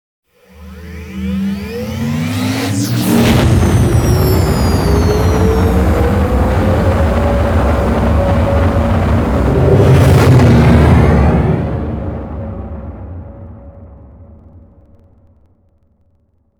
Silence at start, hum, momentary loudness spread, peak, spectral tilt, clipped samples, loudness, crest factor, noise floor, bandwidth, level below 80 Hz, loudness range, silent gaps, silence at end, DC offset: 0.6 s; none; 17 LU; 0 dBFS; -7 dB/octave; under 0.1%; -12 LUFS; 12 dB; -56 dBFS; 20 kHz; -20 dBFS; 10 LU; none; 2 s; under 0.1%